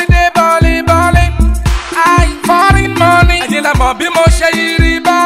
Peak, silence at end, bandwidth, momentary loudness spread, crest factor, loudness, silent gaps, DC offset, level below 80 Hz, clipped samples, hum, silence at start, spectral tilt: 0 dBFS; 0 s; 15.5 kHz; 4 LU; 8 dB; -9 LUFS; none; under 0.1%; -14 dBFS; under 0.1%; none; 0 s; -5 dB/octave